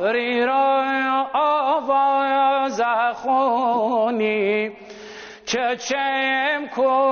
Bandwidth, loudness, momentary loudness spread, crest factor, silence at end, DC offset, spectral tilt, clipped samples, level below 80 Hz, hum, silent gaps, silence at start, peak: 6.8 kHz; -20 LUFS; 6 LU; 10 dB; 0 s; under 0.1%; -1 dB/octave; under 0.1%; -66 dBFS; none; none; 0 s; -10 dBFS